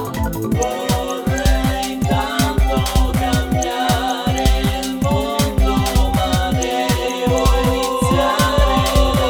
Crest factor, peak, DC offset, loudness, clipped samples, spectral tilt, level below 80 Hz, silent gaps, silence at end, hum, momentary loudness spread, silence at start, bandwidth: 14 dB; -2 dBFS; under 0.1%; -17 LUFS; under 0.1%; -5 dB/octave; -22 dBFS; none; 0 s; none; 5 LU; 0 s; over 20 kHz